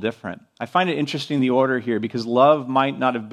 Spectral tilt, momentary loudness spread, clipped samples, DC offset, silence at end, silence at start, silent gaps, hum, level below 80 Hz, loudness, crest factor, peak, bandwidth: -6.5 dB/octave; 12 LU; under 0.1%; under 0.1%; 0 s; 0 s; none; none; -68 dBFS; -20 LUFS; 18 dB; -2 dBFS; 11.5 kHz